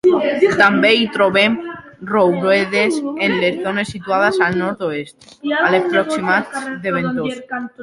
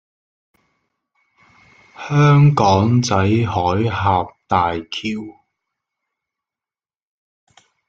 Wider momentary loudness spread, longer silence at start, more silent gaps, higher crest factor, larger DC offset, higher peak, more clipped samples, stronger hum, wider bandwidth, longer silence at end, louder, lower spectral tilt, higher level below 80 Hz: about the same, 12 LU vs 13 LU; second, 0.05 s vs 2 s; neither; about the same, 16 dB vs 18 dB; neither; about the same, 0 dBFS vs -2 dBFS; neither; neither; first, 11.5 kHz vs 7.6 kHz; second, 0 s vs 2.55 s; about the same, -16 LUFS vs -16 LUFS; second, -5 dB/octave vs -6.5 dB/octave; about the same, -56 dBFS vs -52 dBFS